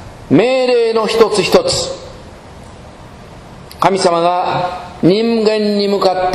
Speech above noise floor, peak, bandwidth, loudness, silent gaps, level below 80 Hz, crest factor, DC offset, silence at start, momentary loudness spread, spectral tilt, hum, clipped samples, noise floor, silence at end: 22 dB; 0 dBFS; 14.5 kHz; -13 LUFS; none; -42 dBFS; 14 dB; under 0.1%; 0 s; 9 LU; -5 dB/octave; none; 0.1%; -35 dBFS; 0 s